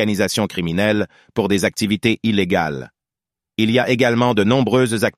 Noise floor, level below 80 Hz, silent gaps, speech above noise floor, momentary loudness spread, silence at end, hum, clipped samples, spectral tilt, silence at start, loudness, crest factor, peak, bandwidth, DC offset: -88 dBFS; -50 dBFS; none; 71 dB; 7 LU; 0.05 s; none; under 0.1%; -5 dB/octave; 0 s; -18 LUFS; 16 dB; -2 dBFS; 15 kHz; under 0.1%